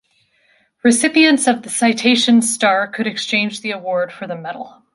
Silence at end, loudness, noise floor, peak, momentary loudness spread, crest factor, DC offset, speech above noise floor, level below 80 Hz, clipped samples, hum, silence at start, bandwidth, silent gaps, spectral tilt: 0.25 s; -15 LUFS; -59 dBFS; -2 dBFS; 15 LU; 16 dB; under 0.1%; 43 dB; -66 dBFS; under 0.1%; none; 0.85 s; 11.5 kHz; none; -2.5 dB/octave